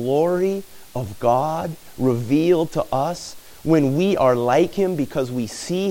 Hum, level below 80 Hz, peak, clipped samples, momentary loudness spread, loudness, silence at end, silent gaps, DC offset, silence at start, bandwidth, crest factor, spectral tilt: none; -50 dBFS; -4 dBFS; under 0.1%; 13 LU; -21 LUFS; 0 s; none; under 0.1%; 0 s; 17 kHz; 16 dB; -6.5 dB/octave